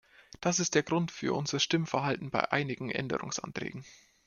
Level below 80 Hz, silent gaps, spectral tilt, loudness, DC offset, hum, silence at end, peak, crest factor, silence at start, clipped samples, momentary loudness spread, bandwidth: -66 dBFS; none; -4 dB/octave; -31 LUFS; under 0.1%; none; 0.3 s; -10 dBFS; 24 dB; 0.4 s; under 0.1%; 9 LU; 10 kHz